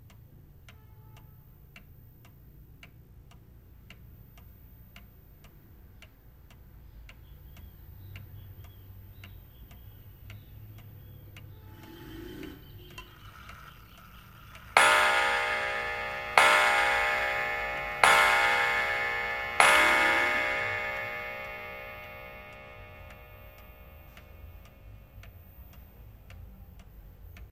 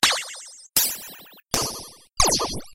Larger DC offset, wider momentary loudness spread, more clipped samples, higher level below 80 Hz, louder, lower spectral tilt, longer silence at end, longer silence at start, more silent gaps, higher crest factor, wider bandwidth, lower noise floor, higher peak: neither; first, 29 LU vs 19 LU; neither; second, -54 dBFS vs -42 dBFS; about the same, -24 LUFS vs -22 LUFS; about the same, -2 dB/octave vs -1 dB/octave; about the same, 0.05 s vs 0 s; first, 0.65 s vs 0 s; neither; about the same, 30 dB vs 26 dB; about the same, 16 kHz vs 16 kHz; first, -54 dBFS vs -44 dBFS; about the same, -2 dBFS vs 0 dBFS